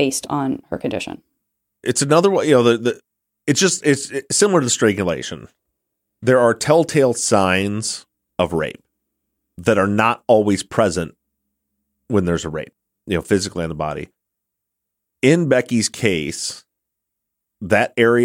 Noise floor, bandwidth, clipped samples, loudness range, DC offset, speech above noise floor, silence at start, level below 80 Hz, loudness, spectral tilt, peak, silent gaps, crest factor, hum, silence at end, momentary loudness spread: -80 dBFS; 16.5 kHz; under 0.1%; 6 LU; under 0.1%; 62 dB; 0 s; -50 dBFS; -18 LUFS; -4.5 dB/octave; -2 dBFS; none; 18 dB; none; 0 s; 14 LU